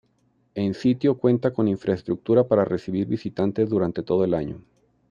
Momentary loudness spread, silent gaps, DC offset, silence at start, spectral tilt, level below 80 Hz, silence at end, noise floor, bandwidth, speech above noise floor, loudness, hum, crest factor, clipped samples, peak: 7 LU; none; under 0.1%; 0.55 s; -9 dB/octave; -58 dBFS; 0.5 s; -66 dBFS; 7.4 kHz; 43 dB; -23 LUFS; none; 18 dB; under 0.1%; -6 dBFS